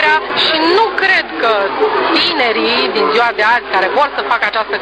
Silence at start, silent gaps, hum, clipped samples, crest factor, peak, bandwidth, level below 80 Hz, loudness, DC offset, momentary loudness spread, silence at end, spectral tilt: 0 s; none; none; under 0.1%; 12 dB; 0 dBFS; 9.8 kHz; -50 dBFS; -12 LUFS; under 0.1%; 3 LU; 0 s; -3.5 dB/octave